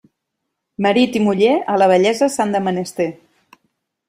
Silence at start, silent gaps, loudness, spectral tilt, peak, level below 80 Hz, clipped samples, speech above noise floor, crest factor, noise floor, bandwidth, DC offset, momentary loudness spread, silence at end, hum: 0.8 s; none; -16 LUFS; -5 dB/octave; -2 dBFS; -62 dBFS; under 0.1%; 61 dB; 16 dB; -77 dBFS; 15.5 kHz; under 0.1%; 9 LU; 0.95 s; none